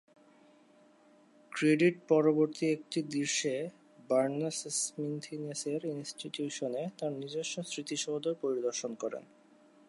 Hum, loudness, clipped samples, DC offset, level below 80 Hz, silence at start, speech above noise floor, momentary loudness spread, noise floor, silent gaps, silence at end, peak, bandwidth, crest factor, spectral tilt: none; -33 LUFS; under 0.1%; under 0.1%; -86 dBFS; 1.5 s; 30 dB; 12 LU; -63 dBFS; none; 0.7 s; -14 dBFS; 11.5 kHz; 20 dB; -4 dB/octave